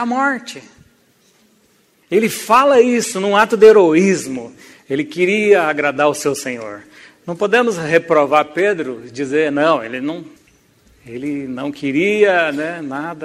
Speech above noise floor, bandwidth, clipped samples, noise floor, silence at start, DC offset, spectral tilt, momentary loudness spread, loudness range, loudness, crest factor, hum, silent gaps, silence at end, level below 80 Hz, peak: 41 dB; 15.5 kHz; under 0.1%; -56 dBFS; 0 s; under 0.1%; -4.5 dB/octave; 17 LU; 6 LU; -15 LUFS; 16 dB; none; none; 0 s; -62 dBFS; 0 dBFS